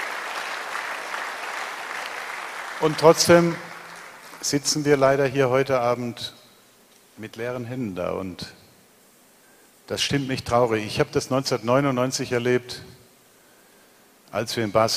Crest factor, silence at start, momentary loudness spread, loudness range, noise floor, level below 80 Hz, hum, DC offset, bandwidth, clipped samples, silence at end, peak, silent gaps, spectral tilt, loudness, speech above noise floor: 24 dB; 0 s; 17 LU; 11 LU; -55 dBFS; -56 dBFS; none; under 0.1%; 15.5 kHz; under 0.1%; 0 s; -2 dBFS; none; -4 dB/octave; -23 LUFS; 33 dB